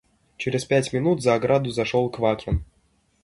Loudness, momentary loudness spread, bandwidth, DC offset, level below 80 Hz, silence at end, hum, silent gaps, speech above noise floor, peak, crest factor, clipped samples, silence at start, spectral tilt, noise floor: -23 LUFS; 7 LU; 11.5 kHz; under 0.1%; -40 dBFS; 0.6 s; none; none; 43 dB; -6 dBFS; 18 dB; under 0.1%; 0.4 s; -6 dB/octave; -65 dBFS